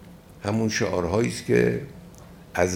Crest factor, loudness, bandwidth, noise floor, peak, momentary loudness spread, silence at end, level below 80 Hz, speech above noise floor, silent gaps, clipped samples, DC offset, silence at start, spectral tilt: 18 dB; -25 LUFS; 17 kHz; -45 dBFS; -6 dBFS; 12 LU; 0 s; -52 dBFS; 22 dB; none; under 0.1%; under 0.1%; 0 s; -5.5 dB/octave